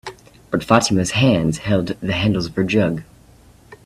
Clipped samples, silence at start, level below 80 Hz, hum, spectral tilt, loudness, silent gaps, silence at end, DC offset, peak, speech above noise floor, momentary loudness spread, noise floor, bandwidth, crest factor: under 0.1%; 0.05 s; -44 dBFS; none; -5.5 dB/octave; -18 LUFS; none; 0.1 s; under 0.1%; 0 dBFS; 30 dB; 10 LU; -48 dBFS; 14 kHz; 20 dB